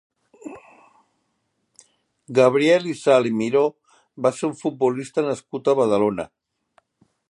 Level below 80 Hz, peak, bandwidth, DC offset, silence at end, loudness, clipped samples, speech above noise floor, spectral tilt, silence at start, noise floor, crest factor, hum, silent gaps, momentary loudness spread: -66 dBFS; -2 dBFS; 11.5 kHz; under 0.1%; 1.05 s; -20 LUFS; under 0.1%; 53 dB; -5.5 dB/octave; 0.45 s; -72 dBFS; 20 dB; none; none; 17 LU